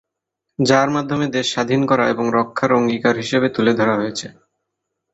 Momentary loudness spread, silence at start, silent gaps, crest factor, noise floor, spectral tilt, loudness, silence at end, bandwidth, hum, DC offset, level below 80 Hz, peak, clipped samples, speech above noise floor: 6 LU; 0.6 s; none; 18 dB; -79 dBFS; -5 dB/octave; -18 LUFS; 0.8 s; 8.2 kHz; none; under 0.1%; -58 dBFS; -2 dBFS; under 0.1%; 62 dB